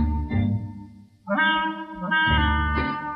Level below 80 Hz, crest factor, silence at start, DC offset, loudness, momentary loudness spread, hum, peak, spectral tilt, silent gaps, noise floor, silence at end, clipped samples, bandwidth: -32 dBFS; 14 dB; 0 s; under 0.1%; -23 LUFS; 14 LU; none; -10 dBFS; -8 dB/octave; none; -45 dBFS; 0 s; under 0.1%; 5.2 kHz